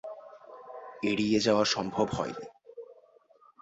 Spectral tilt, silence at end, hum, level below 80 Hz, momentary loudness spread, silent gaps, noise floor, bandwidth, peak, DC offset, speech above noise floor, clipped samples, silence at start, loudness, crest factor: -4.5 dB/octave; 0.7 s; none; -62 dBFS; 24 LU; none; -61 dBFS; 8.2 kHz; -12 dBFS; under 0.1%; 33 dB; under 0.1%; 0.05 s; -28 LUFS; 20 dB